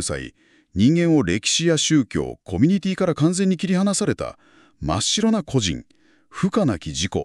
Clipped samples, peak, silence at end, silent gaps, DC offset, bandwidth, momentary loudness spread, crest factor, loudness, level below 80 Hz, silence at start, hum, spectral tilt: under 0.1%; -6 dBFS; 0 s; none; under 0.1%; 12 kHz; 13 LU; 16 dB; -20 LUFS; -44 dBFS; 0 s; none; -4.5 dB/octave